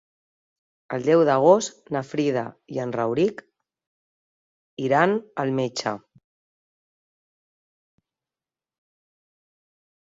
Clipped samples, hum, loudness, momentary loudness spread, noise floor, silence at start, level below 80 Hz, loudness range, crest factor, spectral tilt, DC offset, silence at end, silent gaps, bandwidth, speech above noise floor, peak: under 0.1%; none; -23 LUFS; 13 LU; under -90 dBFS; 0.9 s; -70 dBFS; 10 LU; 24 dB; -5.5 dB/octave; under 0.1%; 4.1 s; 3.87-4.77 s; 7.8 kHz; over 68 dB; -4 dBFS